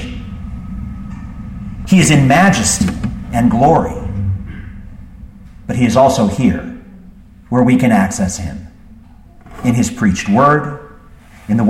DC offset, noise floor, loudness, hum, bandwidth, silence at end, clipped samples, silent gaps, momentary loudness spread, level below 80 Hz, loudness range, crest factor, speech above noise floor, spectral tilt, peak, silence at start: under 0.1%; -40 dBFS; -13 LUFS; none; 16 kHz; 0 s; under 0.1%; none; 20 LU; -32 dBFS; 4 LU; 14 dB; 28 dB; -5.5 dB/octave; 0 dBFS; 0 s